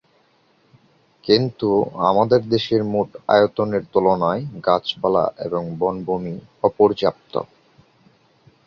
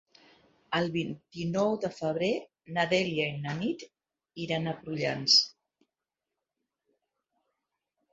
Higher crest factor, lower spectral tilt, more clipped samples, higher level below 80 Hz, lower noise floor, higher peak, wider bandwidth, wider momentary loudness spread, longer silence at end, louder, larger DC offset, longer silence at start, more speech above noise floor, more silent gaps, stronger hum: second, 18 dB vs 24 dB; first, -7.5 dB/octave vs -4 dB/octave; neither; first, -56 dBFS vs -68 dBFS; second, -59 dBFS vs -89 dBFS; first, -2 dBFS vs -10 dBFS; second, 6.6 kHz vs 8 kHz; second, 9 LU vs 15 LU; second, 1.2 s vs 2.65 s; first, -20 LUFS vs -29 LUFS; neither; first, 1.25 s vs 0.7 s; second, 40 dB vs 59 dB; neither; neither